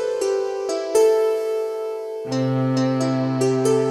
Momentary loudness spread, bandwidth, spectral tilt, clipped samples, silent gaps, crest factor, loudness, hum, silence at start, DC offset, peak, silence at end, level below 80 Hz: 9 LU; 14.5 kHz; -6 dB/octave; under 0.1%; none; 12 dB; -21 LUFS; none; 0 s; under 0.1%; -8 dBFS; 0 s; -64 dBFS